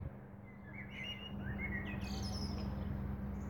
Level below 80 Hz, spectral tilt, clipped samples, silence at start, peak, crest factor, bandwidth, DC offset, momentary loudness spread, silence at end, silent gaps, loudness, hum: -48 dBFS; -5.5 dB/octave; under 0.1%; 0 s; -28 dBFS; 16 dB; 17 kHz; under 0.1%; 10 LU; 0 s; none; -43 LUFS; none